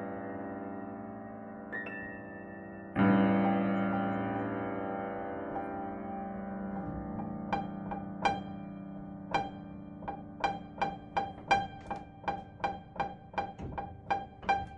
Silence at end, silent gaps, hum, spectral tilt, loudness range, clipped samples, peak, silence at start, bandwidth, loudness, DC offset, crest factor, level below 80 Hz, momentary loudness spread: 0 s; none; none; -7 dB/octave; 6 LU; under 0.1%; -14 dBFS; 0 s; 9 kHz; -36 LUFS; under 0.1%; 22 dB; -58 dBFS; 14 LU